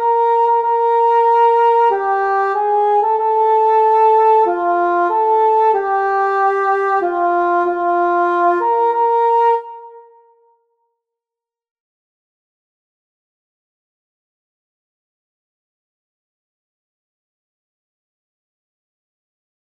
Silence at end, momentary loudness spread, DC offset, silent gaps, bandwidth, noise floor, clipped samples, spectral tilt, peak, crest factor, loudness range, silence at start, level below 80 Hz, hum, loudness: 9.65 s; 4 LU; under 0.1%; none; 6 kHz; -88 dBFS; under 0.1%; -5 dB/octave; -4 dBFS; 12 dB; 5 LU; 0 s; -64 dBFS; none; -14 LUFS